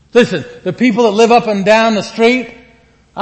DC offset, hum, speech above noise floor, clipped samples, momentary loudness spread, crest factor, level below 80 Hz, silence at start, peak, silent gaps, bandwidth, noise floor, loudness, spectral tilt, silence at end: under 0.1%; none; 36 dB; 0.1%; 12 LU; 12 dB; -52 dBFS; 0.15 s; 0 dBFS; none; 8.6 kHz; -48 dBFS; -12 LUFS; -5 dB/octave; 0 s